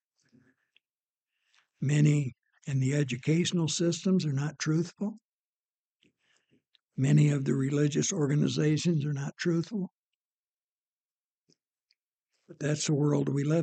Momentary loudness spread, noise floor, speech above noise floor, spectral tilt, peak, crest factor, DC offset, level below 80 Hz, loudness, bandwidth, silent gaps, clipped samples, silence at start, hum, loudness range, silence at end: 11 LU; under -90 dBFS; over 63 dB; -6 dB/octave; -12 dBFS; 18 dB; under 0.1%; -72 dBFS; -29 LUFS; 9 kHz; 5.24-5.64 s, 5.70-6.00 s, 9.97-11.45 s, 12.13-12.18 s; under 0.1%; 1.8 s; none; 8 LU; 0 s